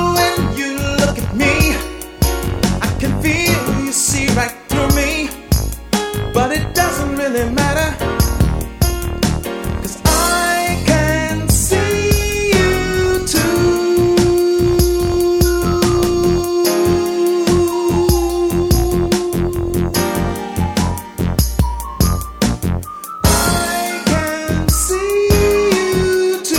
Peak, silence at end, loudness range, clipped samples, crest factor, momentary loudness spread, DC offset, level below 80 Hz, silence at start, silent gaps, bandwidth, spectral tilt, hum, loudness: 0 dBFS; 0 s; 3 LU; under 0.1%; 14 dB; 5 LU; under 0.1%; -24 dBFS; 0 s; none; 18 kHz; -4.5 dB/octave; none; -16 LUFS